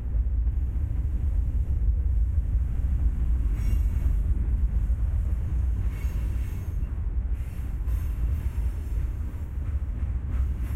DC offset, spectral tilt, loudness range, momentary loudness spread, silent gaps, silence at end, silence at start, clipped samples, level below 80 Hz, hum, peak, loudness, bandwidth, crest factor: under 0.1%; -8.5 dB/octave; 4 LU; 5 LU; none; 0 s; 0 s; under 0.1%; -26 dBFS; none; -14 dBFS; -29 LUFS; 3.1 kHz; 12 dB